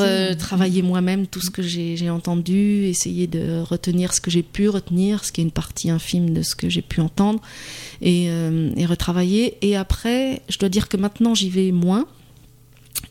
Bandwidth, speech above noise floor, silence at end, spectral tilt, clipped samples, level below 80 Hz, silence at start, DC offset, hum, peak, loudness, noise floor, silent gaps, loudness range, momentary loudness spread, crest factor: 16.5 kHz; 28 dB; 0.05 s; -5 dB/octave; under 0.1%; -40 dBFS; 0 s; under 0.1%; none; -4 dBFS; -21 LUFS; -48 dBFS; none; 1 LU; 5 LU; 16 dB